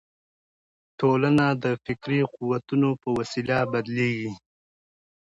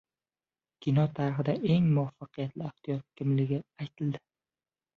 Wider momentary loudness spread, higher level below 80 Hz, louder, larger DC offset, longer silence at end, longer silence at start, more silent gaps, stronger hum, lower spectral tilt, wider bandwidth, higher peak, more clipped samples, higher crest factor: second, 9 LU vs 12 LU; first, -60 dBFS vs -66 dBFS; first, -25 LUFS vs -31 LUFS; neither; first, 0.95 s vs 0.8 s; first, 1 s vs 0.8 s; neither; neither; second, -7.5 dB/octave vs -9.5 dB/octave; first, 10.5 kHz vs 6 kHz; first, -10 dBFS vs -16 dBFS; neither; about the same, 16 dB vs 16 dB